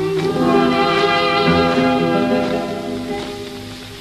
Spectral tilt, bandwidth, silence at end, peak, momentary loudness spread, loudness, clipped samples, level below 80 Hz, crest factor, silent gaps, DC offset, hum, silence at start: -5.5 dB/octave; 13.5 kHz; 0 s; -2 dBFS; 14 LU; -16 LUFS; under 0.1%; -44 dBFS; 16 dB; none; under 0.1%; 50 Hz at -40 dBFS; 0 s